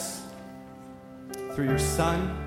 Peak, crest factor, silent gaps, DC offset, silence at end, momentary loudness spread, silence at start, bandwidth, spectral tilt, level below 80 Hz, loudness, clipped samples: -12 dBFS; 18 dB; none; under 0.1%; 0 s; 20 LU; 0 s; 16.5 kHz; -5 dB/octave; -40 dBFS; -28 LUFS; under 0.1%